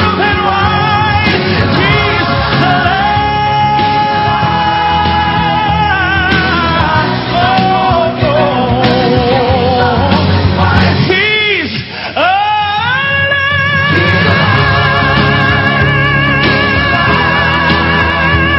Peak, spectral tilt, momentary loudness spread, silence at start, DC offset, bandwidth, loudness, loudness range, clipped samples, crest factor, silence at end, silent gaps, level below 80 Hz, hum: 0 dBFS; -7.5 dB/octave; 2 LU; 0 s; under 0.1%; 8 kHz; -10 LUFS; 2 LU; 0.2%; 10 dB; 0 s; none; -24 dBFS; none